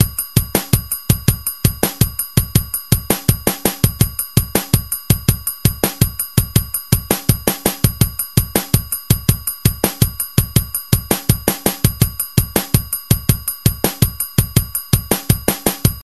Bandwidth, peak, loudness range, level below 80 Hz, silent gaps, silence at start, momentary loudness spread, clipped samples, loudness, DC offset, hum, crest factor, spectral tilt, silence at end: 15 kHz; 0 dBFS; 0 LU; -28 dBFS; none; 0 s; 2 LU; under 0.1%; -17 LUFS; 0.6%; none; 18 dB; -4.5 dB/octave; 0 s